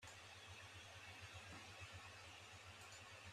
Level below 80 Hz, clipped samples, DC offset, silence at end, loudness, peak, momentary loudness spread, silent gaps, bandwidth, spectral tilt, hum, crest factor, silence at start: -78 dBFS; under 0.1%; under 0.1%; 0 s; -57 LUFS; -44 dBFS; 2 LU; none; 13.5 kHz; -2.5 dB/octave; none; 16 dB; 0 s